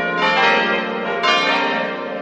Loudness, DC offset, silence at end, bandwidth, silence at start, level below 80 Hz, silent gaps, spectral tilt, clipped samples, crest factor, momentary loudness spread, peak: -17 LUFS; under 0.1%; 0 s; 8.4 kHz; 0 s; -64 dBFS; none; -3.5 dB/octave; under 0.1%; 16 dB; 8 LU; -2 dBFS